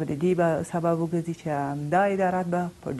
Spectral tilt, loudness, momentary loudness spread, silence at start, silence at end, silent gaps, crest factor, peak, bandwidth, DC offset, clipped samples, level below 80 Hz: -7.5 dB/octave; -26 LUFS; 6 LU; 0 s; 0 s; none; 14 dB; -10 dBFS; 12.5 kHz; under 0.1%; under 0.1%; -58 dBFS